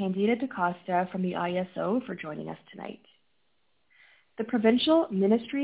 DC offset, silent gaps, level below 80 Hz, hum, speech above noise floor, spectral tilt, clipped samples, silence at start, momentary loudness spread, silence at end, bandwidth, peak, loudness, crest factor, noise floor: under 0.1%; none; -68 dBFS; none; 48 dB; -10 dB/octave; under 0.1%; 0 s; 18 LU; 0 s; 4 kHz; -10 dBFS; -28 LUFS; 18 dB; -75 dBFS